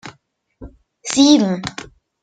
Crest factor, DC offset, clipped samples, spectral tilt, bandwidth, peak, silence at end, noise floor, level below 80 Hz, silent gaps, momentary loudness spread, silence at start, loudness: 18 dB; under 0.1%; under 0.1%; -4 dB/octave; 9.4 kHz; -2 dBFS; 0.4 s; -58 dBFS; -50 dBFS; none; 20 LU; 0.05 s; -15 LUFS